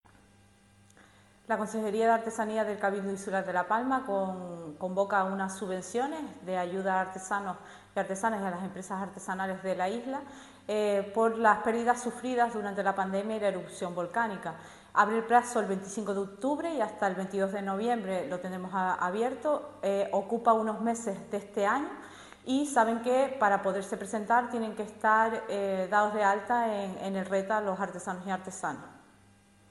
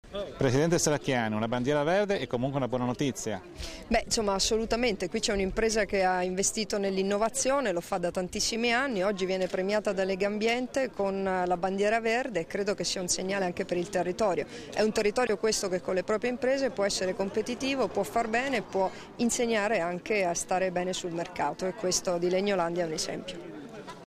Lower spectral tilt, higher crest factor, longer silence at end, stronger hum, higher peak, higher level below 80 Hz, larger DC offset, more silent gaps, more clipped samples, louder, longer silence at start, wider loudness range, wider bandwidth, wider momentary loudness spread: first, -5 dB/octave vs -3.5 dB/octave; first, 22 dB vs 14 dB; first, 0.75 s vs 0.05 s; neither; first, -8 dBFS vs -14 dBFS; second, -70 dBFS vs -50 dBFS; neither; neither; neither; about the same, -30 LUFS vs -29 LUFS; first, 1.5 s vs 0.05 s; first, 5 LU vs 2 LU; second, 12.5 kHz vs 15.5 kHz; first, 10 LU vs 5 LU